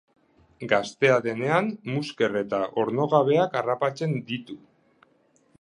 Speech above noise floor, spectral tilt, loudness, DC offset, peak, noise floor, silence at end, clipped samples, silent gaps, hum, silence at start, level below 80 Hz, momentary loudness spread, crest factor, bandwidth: 39 dB; -6 dB/octave; -25 LUFS; under 0.1%; -6 dBFS; -64 dBFS; 1.05 s; under 0.1%; none; none; 0.6 s; -70 dBFS; 12 LU; 20 dB; 10.5 kHz